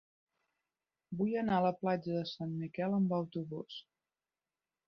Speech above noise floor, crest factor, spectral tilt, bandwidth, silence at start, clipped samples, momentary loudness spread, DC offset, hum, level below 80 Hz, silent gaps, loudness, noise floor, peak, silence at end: over 55 dB; 18 dB; -6 dB/octave; 6.2 kHz; 1.1 s; under 0.1%; 13 LU; under 0.1%; none; -74 dBFS; none; -35 LUFS; under -90 dBFS; -20 dBFS; 1.05 s